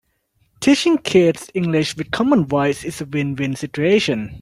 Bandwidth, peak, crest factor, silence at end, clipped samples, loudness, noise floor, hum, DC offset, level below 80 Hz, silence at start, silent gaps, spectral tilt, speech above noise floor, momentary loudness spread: 15 kHz; -2 dBFS; 16 dB; 0 s; under 0.1%; -18 LUFS; -64 dBFS; none; under 0.1%; -52 dBFS; 0.6 s; none; -5.5 dB/octave; 46 dB; 8 LU